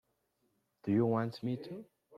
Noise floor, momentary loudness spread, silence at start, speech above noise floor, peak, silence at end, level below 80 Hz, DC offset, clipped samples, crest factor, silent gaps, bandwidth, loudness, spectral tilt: -79 dBFS; 17 LU; 0.85 s; 45 dB; -18 dBFS; 0 s; -76 dBFS; under 0.1%; under 0.1%; 18 dB; none; 11.5 kHz; -35 LUFS; -9 dB/octave